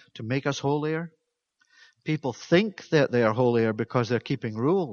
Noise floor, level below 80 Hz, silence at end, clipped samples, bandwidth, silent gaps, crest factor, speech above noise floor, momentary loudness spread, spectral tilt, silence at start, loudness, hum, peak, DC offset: -72 dBFS; -66 dBFS; 0 s; under 0.1%; 7 kHz; none; 20 dB; 47 dB; 9 LU; -6.5 dB/octave; 0.15 s; -26 LUFS; none; -6 dBFS; under 0.1%